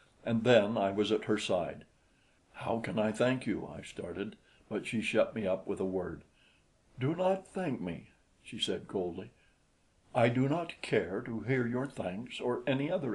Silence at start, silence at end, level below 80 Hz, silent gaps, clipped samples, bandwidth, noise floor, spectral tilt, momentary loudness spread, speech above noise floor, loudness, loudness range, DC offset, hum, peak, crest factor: 0.25 s; 0 s; -66 dBFS; none; under 0.1%; 11.5 kHz; -70 dBFS; -6 dB/octave; 13 LU; 37 dB; -33 LUFS; 4 LU; under 0.1%; none; -10 dBFS; 24 dB